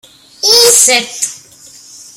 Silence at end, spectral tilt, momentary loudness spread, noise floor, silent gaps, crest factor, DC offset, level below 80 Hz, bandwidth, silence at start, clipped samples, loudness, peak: 0.8 s; 1.5 dB/octave; 14 LU; -38 dBFS; none; 12 dB; under 0.1%; -60 dBFS; over 20 kHz; 0.45 s; 0.3%; -7 LUFS; 0 dBFS